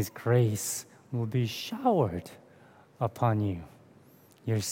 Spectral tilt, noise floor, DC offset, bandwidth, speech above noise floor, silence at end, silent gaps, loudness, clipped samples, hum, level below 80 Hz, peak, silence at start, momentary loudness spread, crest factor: -5.5 dB/octave; -58 dBFS; under 0.1%; 17 kHz; 29 dB; 0 s; none; -30 LUFS; under 0.1%; none; -66 dBFS; -12 dBFS; 0 s; 13 LU; 18 dB